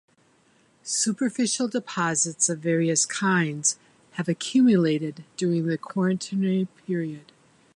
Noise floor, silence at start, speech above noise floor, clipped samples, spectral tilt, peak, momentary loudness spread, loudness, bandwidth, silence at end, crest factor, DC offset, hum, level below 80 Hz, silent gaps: -62 dBFS; 0.85 s; 38 dB; under 0.1%; -4 dB/octave; -8 dBFS; 10 LU; -24 LUFS; 11.5 kHz; 0.55 s; 18 dB; under 0.1%; none; -74 dBFS; none